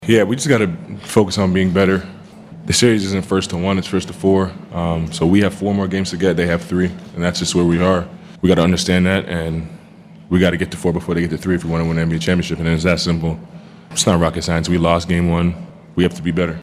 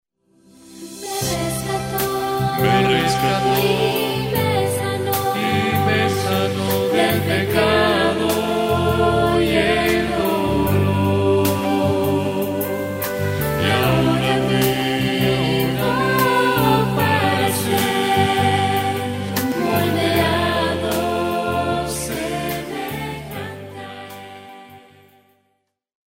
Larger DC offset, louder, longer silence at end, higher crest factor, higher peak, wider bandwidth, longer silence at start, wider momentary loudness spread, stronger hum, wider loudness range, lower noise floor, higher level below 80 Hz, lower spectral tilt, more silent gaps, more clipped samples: neither; about the same, -17 LUFS vs -19 LUFS; second, 0 s vs 1.35 s; about the same, 16 dB vs 16 dB; about the same, 0 dBFS vs -2 dBFS; second, 14 kHz vs 16.5 kHz; second, 0 s vs 0.65 s; about the same, 8 LU vs 8 LU; neither; second, 2 LU vs 6 LU; second, -41 dBFS vs -70 dBFS; about the same, -42 dBFS vs -42 dBFS; about the same, -5.5 dB/octave vs -5 dB/octave; neither; neither